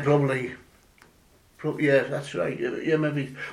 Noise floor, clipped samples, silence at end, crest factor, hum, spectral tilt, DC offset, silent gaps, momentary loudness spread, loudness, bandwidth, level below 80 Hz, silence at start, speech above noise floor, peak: -59 dBFS; under 0.1%; 0 s; 18 dB; none; -7 dB/octave; under 0.1%; none; 11 LU; -26 LUFS; 13 kHz; -64 dBFS; 0 s; 34 dB; -8 dBFS